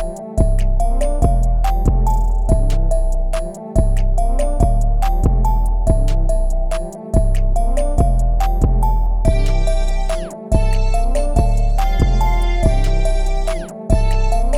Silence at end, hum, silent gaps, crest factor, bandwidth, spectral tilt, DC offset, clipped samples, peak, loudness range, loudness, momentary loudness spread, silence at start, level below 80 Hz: 0 s; none; none; 14 dB; 11.5 kHz; -7 dB/octave; under 0.1%; under 0.1%; 0 dBFS; 1 LU; -19 LUFS; 5 LU; 0 s; -14 dBFS